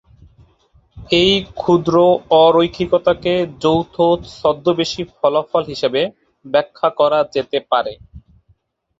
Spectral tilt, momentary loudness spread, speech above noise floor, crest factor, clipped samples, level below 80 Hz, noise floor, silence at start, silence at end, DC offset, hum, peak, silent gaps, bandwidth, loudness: -6 dB/octave; 7 LU; 43 dB; 16 dB; under 0.1%; -46 dBFS; -59 dBFS; 0.95 s; 0.8 s; under 0.1%; none; 0 dBFS; none; 7.8 kHz; -16 LUFS